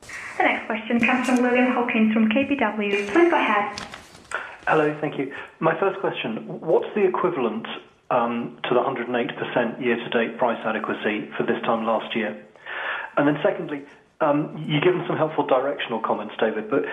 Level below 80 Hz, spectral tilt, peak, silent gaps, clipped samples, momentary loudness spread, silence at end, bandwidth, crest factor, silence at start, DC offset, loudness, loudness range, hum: -64 dBFS; -6 dB/octave; -4 dBFS; none; under 0.1%; 11 LU; 0 s; 11.5 kHz; 18 dB; 0 s; under 0.1%; -23 LUFS; 4 LU; none